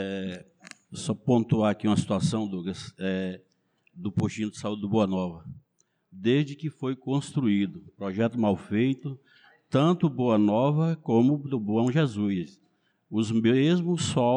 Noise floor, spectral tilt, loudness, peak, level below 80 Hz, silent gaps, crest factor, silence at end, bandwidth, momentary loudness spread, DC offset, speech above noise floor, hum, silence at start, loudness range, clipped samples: -72 dBFS; -7 dB/octave; -27 LUFS; -12 dBFS; -64 dBFS; none; 14 dB; 0 s; 10.5 kHz; 13 LU; under 0.1%; 46 dB; none; 0 s; 5 LU; under 0.1%